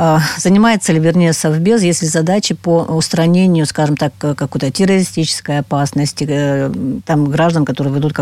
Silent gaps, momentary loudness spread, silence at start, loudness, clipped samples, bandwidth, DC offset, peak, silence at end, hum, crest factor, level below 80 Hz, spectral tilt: none; 6 LU; 0 s; -14 LUFS; under 0.1%; 15 kHz; under 0.1%; -2 dBFS; 0 s; none; 12 dB; -48 dBFS; -5.5 dB/octave